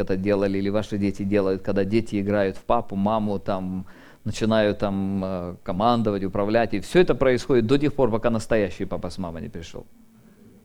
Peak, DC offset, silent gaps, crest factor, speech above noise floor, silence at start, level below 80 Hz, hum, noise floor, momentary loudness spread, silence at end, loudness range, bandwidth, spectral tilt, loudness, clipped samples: -4 dBFS; under 0.1%; none; 18 dB; 28 dB; 0 s; -42 dBFS; none; -51 dBFS; 12 LU; 0.75 s; 3 LU; 13.5 kHz; -7 dB/octave; -23 LUFS; under 0.1%